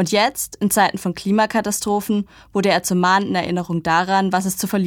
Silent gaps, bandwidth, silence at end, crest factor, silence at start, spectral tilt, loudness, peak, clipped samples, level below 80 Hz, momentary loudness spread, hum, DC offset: none; 18.5 kHz; 0 s; 16 dB; 0 s; -4 dB/octave; -19 LUFS; -2 dBFS; under 0.1%; -52 dBFS; 6 LU; none; under 0.1%